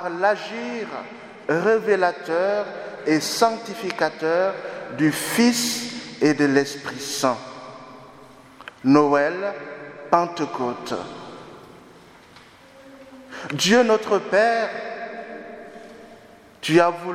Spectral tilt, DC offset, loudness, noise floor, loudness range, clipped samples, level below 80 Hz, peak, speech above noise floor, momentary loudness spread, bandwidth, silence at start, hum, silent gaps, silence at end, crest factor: -4 dB/octave; under 0.1%; -22 LUFS; -48 dBFS; 6 LU; under 0.1%; -66 dBFS; 0 dBFS; 27 dB; 21 LU; 16 kHz; 0 s; none; none; 0 s; 22 dB